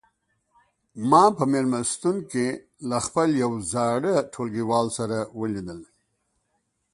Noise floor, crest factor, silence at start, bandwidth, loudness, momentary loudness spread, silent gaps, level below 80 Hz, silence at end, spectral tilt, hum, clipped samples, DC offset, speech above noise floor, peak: -74 dBFS; 20 dB; 0.95 s; 11.5 kHz; -24 LUFS; 12 LU; none; -60 dBFS; 1.1 s; -5 dB/octave; none; under 0.1%; under 0.1%; 51 dB; -4 dBFS